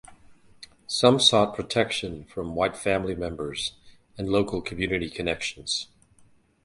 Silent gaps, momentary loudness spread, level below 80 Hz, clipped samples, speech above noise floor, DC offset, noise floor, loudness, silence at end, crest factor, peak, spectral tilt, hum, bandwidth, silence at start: none; 14 LU; -50 dBFS; under 0.1%; 33 dB; under 0.1%; -58 dBFS; -25 LUFS; 0.8 s; 24 dB; -2 dBFS; -4 dB/octave; none; 11.5 kHz; 0.1 s